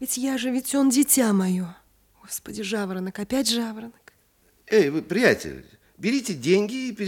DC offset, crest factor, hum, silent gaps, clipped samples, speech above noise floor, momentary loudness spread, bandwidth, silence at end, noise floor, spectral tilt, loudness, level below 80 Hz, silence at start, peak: under 0.1%; 20 dB; none; none; under 0.1%; 39 dB; 15 LU; 18 kHz; 0 s; -62 dBFS; -4 dB/octave; -23 LUFS; -60 dBFS; 0 s; -4 dBFS